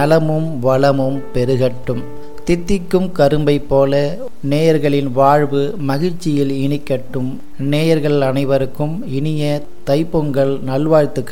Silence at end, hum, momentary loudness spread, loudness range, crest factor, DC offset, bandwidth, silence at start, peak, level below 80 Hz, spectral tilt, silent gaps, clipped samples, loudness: 0 s; none; 9 LU; 3 LU; 14 dB; 7%; 16.5 kHz; 0 s; 0 dBFS; -36 dBFS; -7.5 dB/octave; none; under 0.1%; -16 LUFS